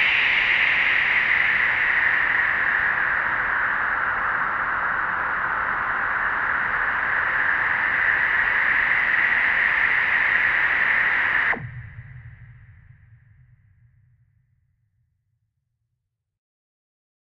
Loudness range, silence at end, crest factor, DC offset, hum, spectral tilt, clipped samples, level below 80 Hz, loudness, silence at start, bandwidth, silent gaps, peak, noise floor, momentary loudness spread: 4 LU; 4.55 s; 16 dB; under 0.1%; none; -4 dB/octave; under 0.1%; -50 dBFS; -19 LUFS; 0 s; 7 kHz; none; -6 dBFS; -79 dBFS; 6 LU